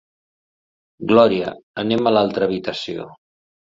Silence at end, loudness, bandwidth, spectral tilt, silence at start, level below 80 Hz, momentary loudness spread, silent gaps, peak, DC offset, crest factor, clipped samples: 0.65 s; -19 LUFS; 7.8 kHz; -6.5 dB/octave; 1 s; -58 dBFS; 16 LU; 1.63-1.74 s; -2 dBFS; under 0.1%; 18 dB; under 0.1%